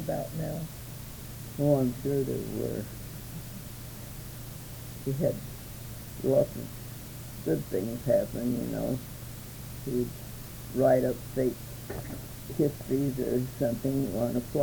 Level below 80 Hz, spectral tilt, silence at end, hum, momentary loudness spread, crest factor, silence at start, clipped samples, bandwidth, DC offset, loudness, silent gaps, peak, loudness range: -50 dBFS; -7 dB/octave; 0 s; none; 15 LU; 20 dB; 0 s; under 0.1%; over 20 kHz; under 0.1%; -32 LUFS; none; -12 dBFS; 6 LU